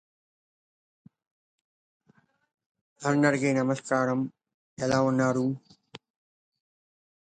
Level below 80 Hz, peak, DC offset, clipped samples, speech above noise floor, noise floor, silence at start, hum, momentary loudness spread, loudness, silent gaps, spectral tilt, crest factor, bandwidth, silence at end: -68 dBFS; -8 dBFS; under 0.1%; under 0.1%; 41 dB; -66 dBFS; 3 s; none; 10 LU; -27 LUFS; 4.54-4.77 s; -6 dB/octave; 22 dB; 9.4 kHz; 1.25 s